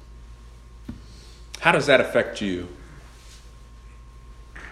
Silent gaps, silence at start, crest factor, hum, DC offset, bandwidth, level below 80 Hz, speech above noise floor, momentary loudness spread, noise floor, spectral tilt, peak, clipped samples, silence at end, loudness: none; 0 s; 26 dB; none; under 0.1%; 13.5 kHz; -44 dBFS; 24 dB; 28 LU; -45 dBFS; -4.5 dB/octave; -2 dBFS; under 0.1%; 0 s; -21 LUFS